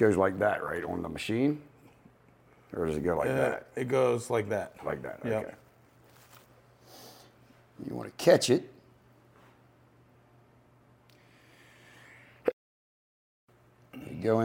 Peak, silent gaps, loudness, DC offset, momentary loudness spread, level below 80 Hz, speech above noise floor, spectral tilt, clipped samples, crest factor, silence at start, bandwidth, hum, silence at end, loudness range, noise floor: -8 dBFS; 12.53-13.48 s; -30 LUFS; under 0.1%; 25 LU; -62 dBFS; 33 dB; -5.5 dB/octave; under 0.1%; 24 dB; 0 s; 16.5 kHz; none; 0 s; 12 LU; -62 dBFS